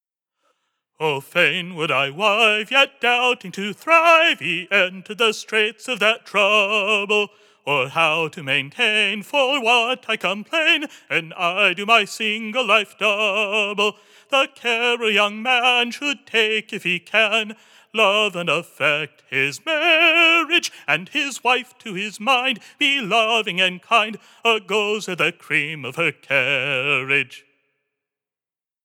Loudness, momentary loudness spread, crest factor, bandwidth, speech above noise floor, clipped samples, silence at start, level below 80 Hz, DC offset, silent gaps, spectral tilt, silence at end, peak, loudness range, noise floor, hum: -18 LUFS; 8 LU; 20 dB; 18.5 kHz; over 70 dB; under 0.1%; 1 s; under -90 dBFS; under 0.1%; none; -2.5 dB/octave; 1.45 s; 0 dBFS; 3 LU; under -90 dBFS; none